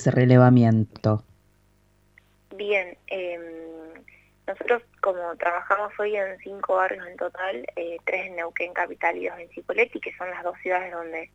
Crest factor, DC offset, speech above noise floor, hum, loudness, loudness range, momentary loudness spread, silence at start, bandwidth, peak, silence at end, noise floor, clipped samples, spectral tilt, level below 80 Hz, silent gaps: 22 dB; under 0.1%; 38 dB; 50 Hz at -65 dBFS; -25 LUFS; 6 LU; 15 LU; 0 s; 7.8 kHz; -2 dBFS; 0.1 s; -62 dBFS; under 0.1%; -8 dB/octave; -62 dBFS; none